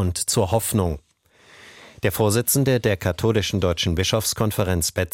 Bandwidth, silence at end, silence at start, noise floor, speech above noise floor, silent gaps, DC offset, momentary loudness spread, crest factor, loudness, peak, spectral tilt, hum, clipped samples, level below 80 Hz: 17 kHz; 0.05 s; 0 s; -55 dBFS; 34 dB; none; under 0.1%; 5 LU; 16 dB; -21 LUFS; -6 dBFS; -4.5 dB/octave; none; under 0.1%; -40 dBFS